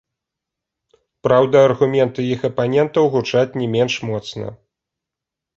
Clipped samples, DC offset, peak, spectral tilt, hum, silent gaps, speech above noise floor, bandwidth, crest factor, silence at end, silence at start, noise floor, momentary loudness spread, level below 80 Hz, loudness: under 0.1%; under 0.1%; -2 dBFS; -6.5 dB/octave; none; none; 68 dB; 7.8 kHz; 18 dB; 1.05 s; 1.25 s; -85 dBFS; 12 LU; -56 dBFS; -17 LUFS